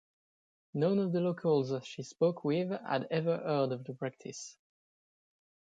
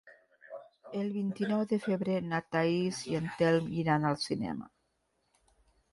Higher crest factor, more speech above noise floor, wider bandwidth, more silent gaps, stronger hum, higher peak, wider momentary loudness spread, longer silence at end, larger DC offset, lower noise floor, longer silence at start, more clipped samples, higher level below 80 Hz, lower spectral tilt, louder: about the same, 16 dB vs 18 dB; first, over 57 dB vs 46 dB; second, 9.2 kHz vs 11.5 kHz; neither; neither; about the same, -18 dBFS vs -16 dBFS; about the same, 14 LU vs 14 LU; about the same, 1.3 s vs 1.25 s; neither; first, under -90 dBFS vs -77 dBFS; first, 0.75 s vs 0.05 s; neither; second, -80 dBFS vs -66 dBFS; about the same, -6.5 dB/octave vs -6.5 dB/octave; about the same, -33 LUFS vs -32 LUFS